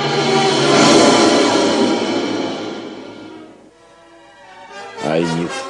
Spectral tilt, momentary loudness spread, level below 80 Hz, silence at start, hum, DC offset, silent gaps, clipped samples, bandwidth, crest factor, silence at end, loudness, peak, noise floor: -3.5 dB/octave; 24 LU; -58 dBFS; 0 s; none; under 0.1%; none; under 0.1%; 11.5 kHz; 16 dB; 0 s; -14 LUFS; 0 dBFS; -45 dBFS